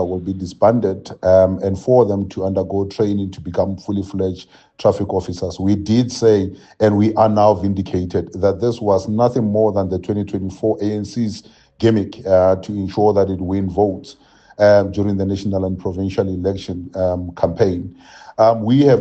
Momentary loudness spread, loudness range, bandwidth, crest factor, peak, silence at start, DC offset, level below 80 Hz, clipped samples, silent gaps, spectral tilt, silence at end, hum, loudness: 10 LU; 4 LU; 8.4 kHz; 16 dB; 0 dBFS; 0 s; under 0.1%; -52 dBFS; under 0.1%; none; -7.5 dB/octave; 0 s; none; -18 LUFS